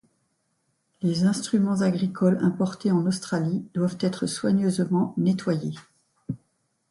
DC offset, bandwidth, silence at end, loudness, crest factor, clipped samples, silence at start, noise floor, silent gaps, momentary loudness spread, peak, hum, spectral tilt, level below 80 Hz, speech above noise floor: under 0.1%; 11.5 kHz; 0.55 s; -25 LUFS; 16 dB; under 0.1%; 1 s; -73 dBFS; none; 10 LU; -10 dBFS; none; -6.5 dB/octave; -64 dBFS; 49 dB